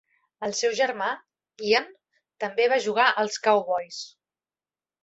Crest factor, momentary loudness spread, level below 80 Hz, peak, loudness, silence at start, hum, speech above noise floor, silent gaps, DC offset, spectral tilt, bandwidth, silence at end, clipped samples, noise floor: 22 dB; 15 LU; -74 dBFS; -6 dBFS; -24 LUFS; 0.4 s; none; over 66 dB; none; under 0.1%; -2 dB/octave; 8.2 kHz; 0.95 s; under 0.1%; under -90 dBFS